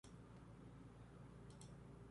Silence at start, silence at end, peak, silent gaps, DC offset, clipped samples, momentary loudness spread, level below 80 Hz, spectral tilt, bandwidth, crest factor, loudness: 0.05 s; 0 s; -44 dBFS; none; under 0.1%; under 0.1%; 2 LU; -68 dBFS; -6 dB/octave; 11.5 kHz; 16 dB; -61 LUFS